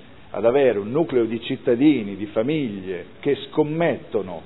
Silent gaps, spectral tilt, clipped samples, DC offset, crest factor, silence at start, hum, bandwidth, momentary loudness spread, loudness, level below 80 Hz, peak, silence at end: none; -10.5 dB/octave; under 0.1%; 0.5%; 16 dB; 0.3 s; none; 4.1 kHz; 10 LU; -22 LUFS; -58 dBFS; -6 dBFS; 0 s